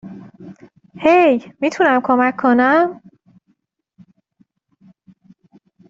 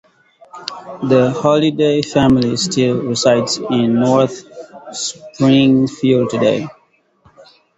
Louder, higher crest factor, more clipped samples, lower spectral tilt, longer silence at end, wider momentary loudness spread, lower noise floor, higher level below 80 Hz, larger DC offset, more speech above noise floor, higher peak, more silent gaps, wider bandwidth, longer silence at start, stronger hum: about the same, -15 LUFS vs -15 LUFS; about the same, 16 dB vs 16 dB; neither; about the same, -5.5 dB/octave vs -5.5 dB/octave; first, 2.95 s vs 1.05 s; second, 10 LU vs 16 LU; first, -65 dBFS vs -56 dBFS; second, -62 dBFS vs -48 dBFS; neither; first, 51 dB vs 42 dB; about the same, -2 dBFS vs 0 dBFS; neither; about the same, 7.6 kHz vs 8.2 kHz; second, 0.05 s vs 0.55 s; neither